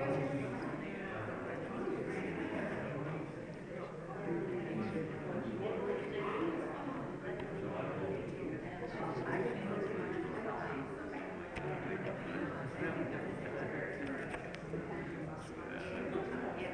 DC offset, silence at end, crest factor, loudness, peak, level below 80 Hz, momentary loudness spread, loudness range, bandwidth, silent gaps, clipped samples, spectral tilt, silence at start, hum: under 0.1%; 0 s; 16 dB; -41 LUFS; -24 dBFS; -62 dBFS; 5 LU; 2 LU; 10.5 kHz; none; under 0.1%; -7.5 dB/octave; 0 s; none